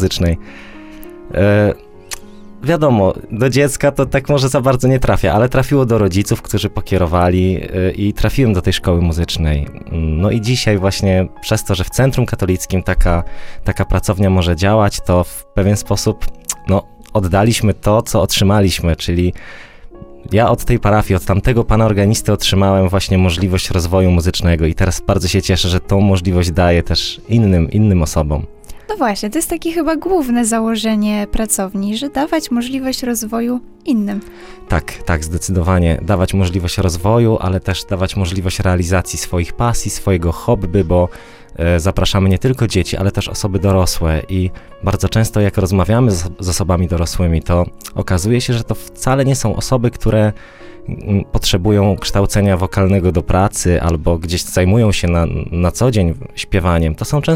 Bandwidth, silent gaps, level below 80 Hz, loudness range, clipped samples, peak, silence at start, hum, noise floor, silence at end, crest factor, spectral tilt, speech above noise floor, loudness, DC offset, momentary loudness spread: 16.5 kHz; none; -26 dBFS; 3 LU; under 0.1%; 0 dBFS; 0 s; none; -34 dBFS; 0 s; 14 dB; -5.5 dB/octave; 20 dB; -15 LUFS; under 0.1%; 7 LU